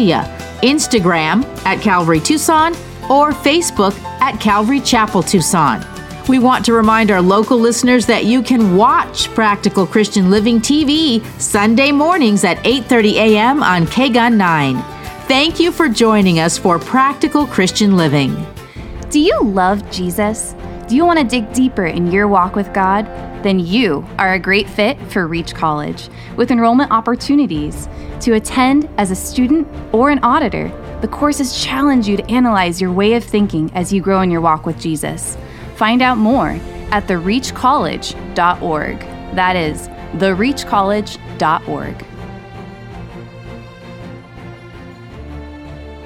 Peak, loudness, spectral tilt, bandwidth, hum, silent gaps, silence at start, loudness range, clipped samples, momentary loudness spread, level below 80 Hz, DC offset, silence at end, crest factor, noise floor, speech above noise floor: 0 dBFS; -14 LUFS; -4.5 dB/octave; 16.5 kHz; none; none; 0 s; 5 LU; under 0.1%; 17 LU; -36 dBFS; under 0.1%; 0 s; 14 dB; -34 dBFS; 20 dB